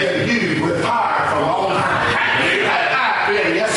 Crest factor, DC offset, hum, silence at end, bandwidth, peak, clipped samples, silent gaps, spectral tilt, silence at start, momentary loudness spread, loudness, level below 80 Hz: 12 dB; under 0.1%; none; 0 s; 11.5 kHz; -6 dBFS; under 0.1%; none; -4 dB/octave; 0 s; 3 LU; -16 LUFS; -50 dBFS